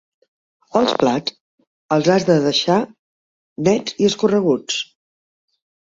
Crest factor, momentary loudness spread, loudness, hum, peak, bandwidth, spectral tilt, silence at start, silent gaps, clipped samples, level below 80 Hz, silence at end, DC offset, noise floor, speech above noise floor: 18 dB; 9 LU; -18 LUFS; none; -2 dBFS; 7.8 kHz; -5 dB/octave; 0.75 s; 1.40-1.58 s, 1.67-1.89 s, 2.99-3.56 s; under 0.1%; -60 dBFS; 1.1 s; under 0.1%; under -90 dBFS; over 73 dB